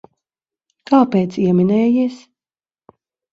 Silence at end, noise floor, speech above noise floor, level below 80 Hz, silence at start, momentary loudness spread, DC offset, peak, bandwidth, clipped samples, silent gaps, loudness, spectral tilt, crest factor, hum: 1.15 s; under -90 dBFS; over 75 dB; -60 dBFS; 0.9 s; 4 LU; under 0.1%; 0 dBFS; 7.6 kHz; under 0.1%; none; -16 LUFS; -9 dB/octave; 18 dB; none